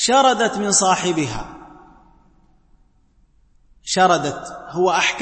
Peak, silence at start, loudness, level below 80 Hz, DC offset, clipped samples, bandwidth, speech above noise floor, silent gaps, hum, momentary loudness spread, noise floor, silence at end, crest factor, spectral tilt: -4 dBFS; 0 s; -18 LUFS; -48 dBFS; under 0.1%; under 0.1%; 8.8 kHz; 39 dB; none; none; 17 LU; -57 dBFS; 0 s; 18 dB; -2.5 dB/octave